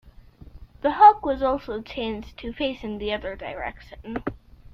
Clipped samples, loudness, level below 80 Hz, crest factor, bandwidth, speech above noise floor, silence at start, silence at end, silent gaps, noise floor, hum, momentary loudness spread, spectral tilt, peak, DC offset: under 0.1%; -23 LUFS; -46 dBFS; 22 dB; 6 kHz; 24 dB; 0.05 s; 0.05 s; none; -47 dBFS; none; 20 LU; -7 dB/octave; -4 dBFS; under 0.1%